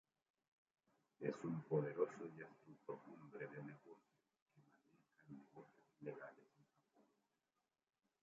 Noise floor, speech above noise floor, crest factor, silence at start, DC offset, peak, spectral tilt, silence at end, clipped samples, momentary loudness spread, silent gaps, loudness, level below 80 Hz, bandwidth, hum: under -90 dBFS; over 41 dB; 26 dB; 1.2 s; under 0.1%; -26 dBFS; -8 dB/octave; 1.8 s; under 0.1%; 21 LU; 4.42-4.46 s; -49 LUFS; under -90 dBFS; 7.4 kHz; none